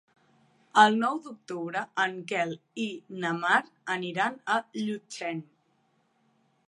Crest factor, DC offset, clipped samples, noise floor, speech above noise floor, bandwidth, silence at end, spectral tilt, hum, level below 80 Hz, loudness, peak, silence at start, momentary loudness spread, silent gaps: 24 dB; under 0.1%; under 0.1%; -70 dBFS; 42 dB; 11 kHz; 1.25 s; -4 dB/octave; none; -84 dBFS; -28 LUFS; -6 dBFS; 0.75 s; 14 LU; none